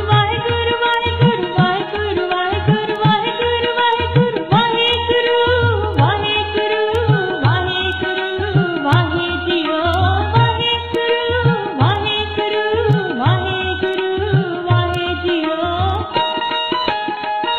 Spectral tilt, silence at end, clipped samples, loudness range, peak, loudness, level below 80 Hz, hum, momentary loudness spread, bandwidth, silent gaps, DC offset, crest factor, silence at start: -7.5 dB/octave; 0 s; under 0.1%; 3 LU; -2 dBFS; -16 LUFS; -32 dBFS; none; 4 LU; 7.6 kHz; none; 0.3%; 14 dB; 0 s